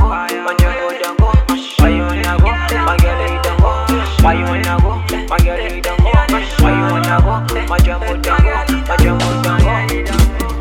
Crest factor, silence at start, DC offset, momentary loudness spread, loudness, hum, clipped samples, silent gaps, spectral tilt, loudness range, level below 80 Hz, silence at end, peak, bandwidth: 12 dB; 0 s; under 0.1%; 4 LU; -14 LUFS; none; under 0.1%; none; -6 dB/octave; 1 LU; -16 dBFS; 0 s; 0 dBFS; 17 kHz